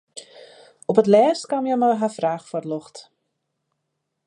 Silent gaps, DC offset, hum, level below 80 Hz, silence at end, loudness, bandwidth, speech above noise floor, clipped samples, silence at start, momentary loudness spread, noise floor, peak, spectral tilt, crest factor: none; under 0.1%; none; -76 dBFS; 1.25 s; -20 LUFS; 11 kHz; 58 dB; under 0.1%; 0.15 s; 16 LU; -77 dBFS; -4 dBFS; -6 dB/octave; 20 dB